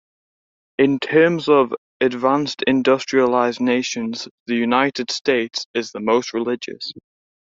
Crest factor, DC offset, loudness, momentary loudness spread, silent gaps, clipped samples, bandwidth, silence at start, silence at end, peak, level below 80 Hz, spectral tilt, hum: 18 dB; under 0.1%; -19 LUFS; 10 LU; 1.78-2.00 s, 4.31-4.46 s, 5.66-5.74 s; under 0.1%; 7.8 kHz; 0.8 s; 0.55 s; -2 dBFS; -64 dBFS; -4.5 dB/octave; none